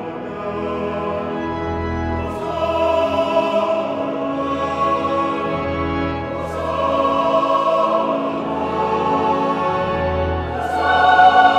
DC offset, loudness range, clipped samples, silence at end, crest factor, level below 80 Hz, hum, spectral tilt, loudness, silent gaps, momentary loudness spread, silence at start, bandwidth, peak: under 0.1%; 3 LU; under 0.1%; 0 s; 18 dB; -38 dBFS; none; -6.5 dB/octave; -19 LUFS; none; 7 LU; 0 s; 11.5 kHz; 0 dBFS